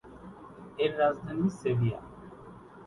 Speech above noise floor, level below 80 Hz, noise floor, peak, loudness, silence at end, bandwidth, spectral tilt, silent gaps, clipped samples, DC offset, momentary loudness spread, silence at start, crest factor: 21 dB; -58 dBFS; -49 dBFS; -14 dBFS; -30 LUFS; 0 s; 11.5 kHz; -7.5 dB/octave; none; under 0.1%; under 0.1%; 21 LU; 0.05 s; 18 dB